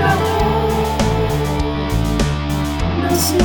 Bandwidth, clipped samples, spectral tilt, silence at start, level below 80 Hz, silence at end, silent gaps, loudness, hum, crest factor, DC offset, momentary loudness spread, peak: 19.5 kHz; under 0.1%; -5.5 dB/octave; 0 s; -24 dBFS; 0 s; none; -18 LUFS; none; 16 dB; 0.9%; 4 LU; 0 dBFS